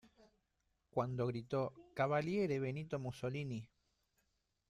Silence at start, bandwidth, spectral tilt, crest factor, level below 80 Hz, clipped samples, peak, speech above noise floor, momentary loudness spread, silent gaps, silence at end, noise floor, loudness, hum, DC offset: 0.95 s; 12 kHz; -7.5 dB/octave; 18 dB; -72 dBFS; under 0.1%; -22 dBFS; 44 dB; 8 LU; none; 1.05 s; -83 dBFS; -40 LUFS; none; under 0.1%